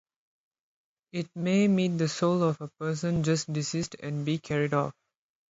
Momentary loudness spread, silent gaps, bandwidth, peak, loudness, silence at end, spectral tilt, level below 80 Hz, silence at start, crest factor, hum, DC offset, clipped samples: 9 LU; none; 8 kHz; -12 dBFS; -28 LUFS; 0.6 s; -6 dB/octave; -62 dBFS; 1.15 s; 18 dB; none; under 0.1%; under 0.1%